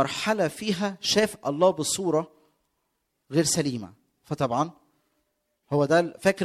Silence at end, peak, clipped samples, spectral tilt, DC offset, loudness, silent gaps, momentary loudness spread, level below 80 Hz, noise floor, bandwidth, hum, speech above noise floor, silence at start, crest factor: 0 s; -8 dBFS; under 0.1%; -4 dB/octave; under 0.1%; -25 LUFS; none; 9 LU; -62 dBFS; -77 dBFS; 15 kHz; none; 52 dB; 0 s; 18 dB